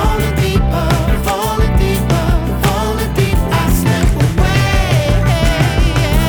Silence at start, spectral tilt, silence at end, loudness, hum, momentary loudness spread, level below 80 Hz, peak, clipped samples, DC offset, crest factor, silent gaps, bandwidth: 0 s; -5.5 dB/octave; 0 s; -14 LUFS; none; 3 LU; -16 dBFS; -2 dBFS; under 0.1%; under 0.1%; 10 dB; none; over 20 kHz